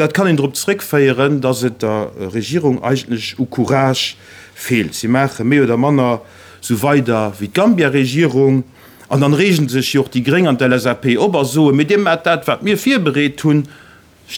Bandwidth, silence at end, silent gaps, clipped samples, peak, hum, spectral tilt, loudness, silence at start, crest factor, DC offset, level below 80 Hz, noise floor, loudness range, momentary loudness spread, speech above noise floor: over 20 kHz; 0 s; none; under 0.1%; 0 dBFS; none; -5.5 dB/octave; -15 LUFS; 0 s; 14 dB; under 0.1%; -58 dBFS; -40 dBFS; 3 LU; 8 LU; 26 dB